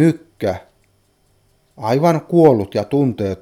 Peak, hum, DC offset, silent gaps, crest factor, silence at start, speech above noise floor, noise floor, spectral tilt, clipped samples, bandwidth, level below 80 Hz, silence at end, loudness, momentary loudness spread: 0 dBFS; none; under 0.1%; none; 18 dB; 0 s; 44 dB; -59 dBFS; -8 dB/octave; under 0.1%; 16 kHz; -54 dBFS; 0.05 s; -17 LUFS; 11 LU